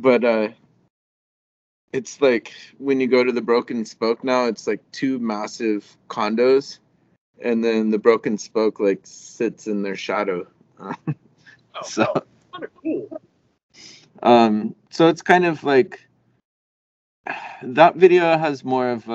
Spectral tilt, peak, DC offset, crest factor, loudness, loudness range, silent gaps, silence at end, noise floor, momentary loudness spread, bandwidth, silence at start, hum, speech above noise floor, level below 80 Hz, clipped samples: -5.5 dB/octave; 0 dBFS; under 0.1%; 20 dB; -20 LUFS; 8 LU; 0.90-1.88 s, 7.18-7.33 s, 13.63-13.69 s, 16.45-17.24 s; 0 s; -52 dBFS; 16 LU; 8 kHz; 0 s; none; 33 dB; -72 dBFS; under 0.1%